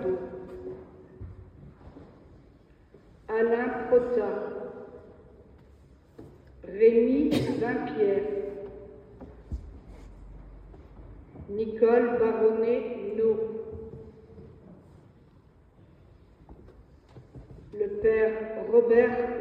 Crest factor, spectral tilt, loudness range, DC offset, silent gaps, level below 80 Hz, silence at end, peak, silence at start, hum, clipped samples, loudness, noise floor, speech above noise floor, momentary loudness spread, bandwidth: 20 dB; -7.5 dB/octave; 13 LU; under 0.1%; none; -52 dBFS; 0 s; -10 dBFS; 0 s; none; under 0.1%; -26 LUFS; -57 dBFS; 32 dB; 27 LU; 9.2 kHz